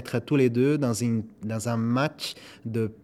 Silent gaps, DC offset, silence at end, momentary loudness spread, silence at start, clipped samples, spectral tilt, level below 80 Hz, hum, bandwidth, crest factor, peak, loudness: none; under 0.1%; 0.1 s; 11 LU; 0 s; under 0.1%; -6 dB/octave; -66 dBFS; none; 15 kHz; 16 dB; -10 dBFS; -26 LUFS